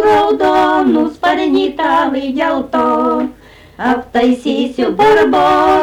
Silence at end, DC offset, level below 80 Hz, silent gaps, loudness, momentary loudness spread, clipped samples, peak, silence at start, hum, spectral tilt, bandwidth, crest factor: 0 s; under 0.1%; -44 dBFS; none; -13 LUFS; 7 LU; under 0.1%; -4 dBFS; 0 s; none; -5.5 dB/octave; 15 kHz; 8 dB